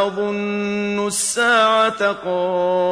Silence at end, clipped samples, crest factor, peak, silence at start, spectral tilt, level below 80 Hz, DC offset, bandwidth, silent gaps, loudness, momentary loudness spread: 0 s; under 0.1%; 16 dB; -4 dBFS; 0 s; -3 dB/octave; -58 dBFS; under 0.1%; 11 kHz; none; -18 LUFS; 8 LU